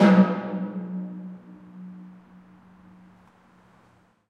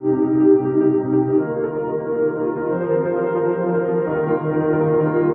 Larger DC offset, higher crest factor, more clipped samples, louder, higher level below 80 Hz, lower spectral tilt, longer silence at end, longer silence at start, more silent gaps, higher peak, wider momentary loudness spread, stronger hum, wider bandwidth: neither; first, 22 dB vs 14 dB; neither; second, -25 LUFS vs -19 LUFS; second, -72 dBFS vs -56 dBFS; second, -8.5 dB/octave vs -13.5 dB/octave; first, 2.2 s vs 0 s; about the same, 0 s vs 0 s; neither; about the same, -6 dBFS vs -4 dBFS; first, 26 LU vs 7 LU; neither; first, 6.6 kHz vs 3 kHz